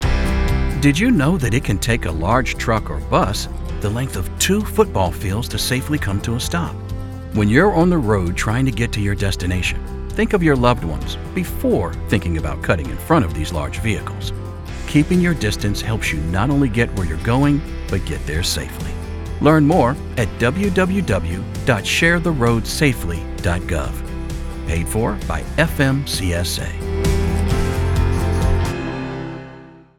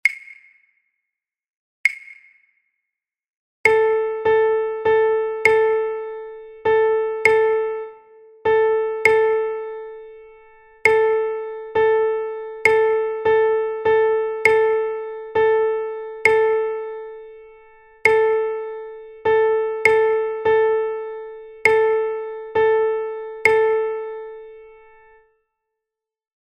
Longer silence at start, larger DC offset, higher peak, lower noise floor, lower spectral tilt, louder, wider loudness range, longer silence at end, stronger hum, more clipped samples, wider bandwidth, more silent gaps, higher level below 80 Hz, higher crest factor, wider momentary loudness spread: about the same, 0 s vs 0.05 s; neither; about the same, 0 dBFS vs 0 dBFS; second, -40 dBFS vs -86 dBFS; first, -5.5 dB/octave vs -3.5 dB/octave; about the same, -19 LUFS vs -19 LUFS; about the same, 3 LU vs 3 LU; second, 0.2 s vs 1.8 s; neither; neither; first, 17.5 kHz vs 9.2 kHz; second, none vs 1.57-1.84 s, 3.37-3.64 s; first, -26 dBFS vs -58 dBFS; about the same, 18 dB vs 20 dB; second, 11 LU vs 16 LU